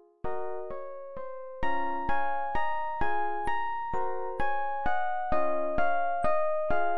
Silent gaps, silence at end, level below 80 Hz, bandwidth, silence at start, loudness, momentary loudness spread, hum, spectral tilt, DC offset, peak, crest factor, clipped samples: none; 0 s; -48 dBFS; 10.5 kHz; 0 s; -32 LUFS; 11 LU; none; -6.5 dB/octave; 3%; -12 dBFS; 16 dB; under 0.1%